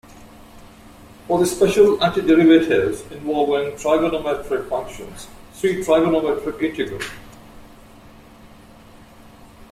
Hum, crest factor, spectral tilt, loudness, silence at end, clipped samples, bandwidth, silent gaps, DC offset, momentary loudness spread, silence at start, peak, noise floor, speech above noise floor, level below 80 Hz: none; 18 dB; -5.5 dB/octave; -19 LUFS; 0.05 s; under 0.1%; 15 kHz; none; under 0.1%; 17 LU; 0.1 s; -2 dBFS; -45 dBFS; 26 dB; -48 dBFS